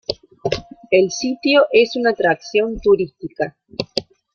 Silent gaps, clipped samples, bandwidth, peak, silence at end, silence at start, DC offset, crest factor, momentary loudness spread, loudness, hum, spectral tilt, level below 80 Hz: none; under 0.1%; 8 kHz; 0 dBFS; 0.35 s; 0.1 s; under 0.1%; 18 dB; 12 LU; -18 LUFS; none; -4 dB/octave; -46 dBFS